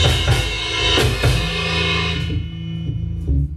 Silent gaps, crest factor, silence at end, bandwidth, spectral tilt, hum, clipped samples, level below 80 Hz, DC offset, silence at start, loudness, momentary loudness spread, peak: none; 16 dB; 0 s; 14.5 kHz; -4.5 dB/octave; none; under 0.1%; -26 dBFS; under 0.1%; 0 s; -19 LUFS; 10 LU; -2 dBFS